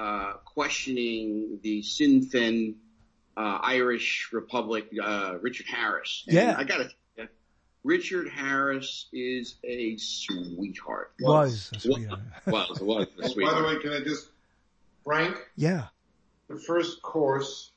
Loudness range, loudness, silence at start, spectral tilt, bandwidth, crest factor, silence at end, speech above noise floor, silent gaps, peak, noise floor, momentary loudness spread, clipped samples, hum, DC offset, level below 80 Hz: 4 LU; -28 LUFS; 0 s; -5 dB/octave; 8.6 kHz; 22 dB; 0.1 s; 41 dB; none; -8 dBFS; -68 dBFS; 13 LU; under 0.1%; none; under 0.1%; -64 dBFS